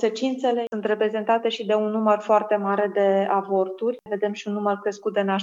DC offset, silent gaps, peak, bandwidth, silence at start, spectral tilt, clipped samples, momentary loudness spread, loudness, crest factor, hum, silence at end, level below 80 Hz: under 0.1%; none; -6 dBFS; 7.6 kHz; 0 s; -6 dB/octave; under 0.1%; 6 LU; -23 LUFS; 16 dB; none; 0 s; -82 dBFS